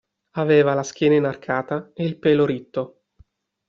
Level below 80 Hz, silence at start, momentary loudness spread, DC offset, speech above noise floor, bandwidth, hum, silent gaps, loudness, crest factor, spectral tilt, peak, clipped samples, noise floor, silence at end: -62 dBFS; 0.35 s; 12 LU; under 0.1%; 37 dB; 7.4 kHz; none; none; -21 LUFS; 16 dB; -5.5 dB/octave; -6 dBFS; under 0.1%; -57 dBFS; 0.8 s